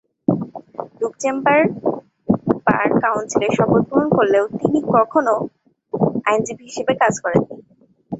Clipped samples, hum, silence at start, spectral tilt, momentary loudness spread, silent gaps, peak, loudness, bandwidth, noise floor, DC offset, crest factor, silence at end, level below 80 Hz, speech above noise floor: under 0.1%; none; 0.3 s; -6 dB/octave; 11 LU; none; 0 dBFS; -18 LUFS; 8.2 kHz; -54 dBFS; under 0.1%; 18 dB; 0 s; -54 dBFS; 37 dB